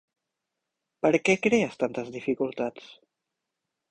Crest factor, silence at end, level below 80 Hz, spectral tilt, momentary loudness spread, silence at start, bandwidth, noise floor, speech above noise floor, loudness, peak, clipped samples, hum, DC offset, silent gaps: 22 dB; 1 s; -68 dBFS; -5 dB/octave; 10 LU; 1.05 s; 9.6 kHz; -85 dBFS; 59 dB; -26 LUFS; -8 dBFS; under 0.1%; none; under 0.1%; none